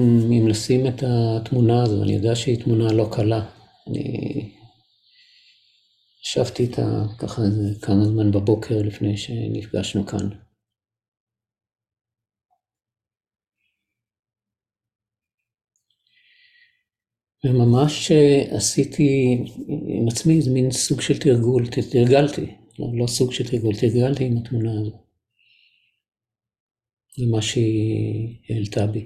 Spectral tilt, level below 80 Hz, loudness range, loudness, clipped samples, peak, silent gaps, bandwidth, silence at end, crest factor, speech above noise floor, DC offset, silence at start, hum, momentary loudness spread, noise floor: -6.5 dB/octave; -48 dBFS; 10 LU; -21 LUFS; under 0.1%; -4 dBFS; 11.08-11.12 s, 11.20-11.27 s, 14.19-14.23 s, 15.34-15.38 s, 26.60-26.69 s; 14 kHz; 0 s; 18 dB; 70 dB; under 0.1%; 0 s; none; 11 LU; -89 dBFS